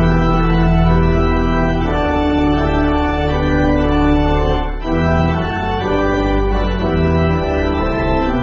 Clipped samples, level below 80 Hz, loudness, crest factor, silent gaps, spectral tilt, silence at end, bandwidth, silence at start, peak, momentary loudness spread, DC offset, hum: under 0.1%; -20 dBFS; -16 LUFS; 12 dB; none; -6 dB/octave; 0 s; 7 kHz; 0 s; -2 dBFS; 4 LU; under 0.1%; none